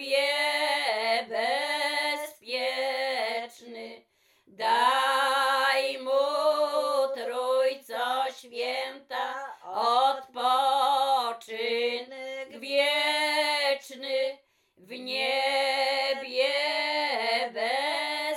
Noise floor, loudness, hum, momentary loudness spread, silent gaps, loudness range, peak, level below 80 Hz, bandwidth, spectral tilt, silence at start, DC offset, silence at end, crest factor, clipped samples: -64 dBFS; -27 LUFS; none; 10 LU; none; 4 LU; -12 dBFS; -88 dBFS; 17 kHz; 0 dB/octave; 0 s; under 0.1%; 0 s; 16 dB; under 0.1%